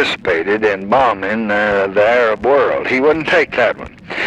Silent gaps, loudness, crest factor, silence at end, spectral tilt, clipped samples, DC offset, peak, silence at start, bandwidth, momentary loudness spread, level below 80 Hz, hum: none; -14 LUFS; 12 dB; 0 s; -5 dB/octave; under 0.1%; under 0.1%; -2 dBFS; 0 s; 10 kHz; 4 LU; -46 dBFS; none